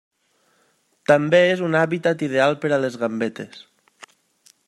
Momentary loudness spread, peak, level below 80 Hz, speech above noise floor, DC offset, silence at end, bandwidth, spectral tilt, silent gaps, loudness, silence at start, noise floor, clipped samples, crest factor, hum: 12 LU; -2 dBFS; -70 dBFS; 45 dB; under 0.1%; 1.1 s; 11.5 kHz; -6 dB/octave; none; -20 LUFS; 1.1 s; -64 dBFS; under 0.1%; 20 dB; none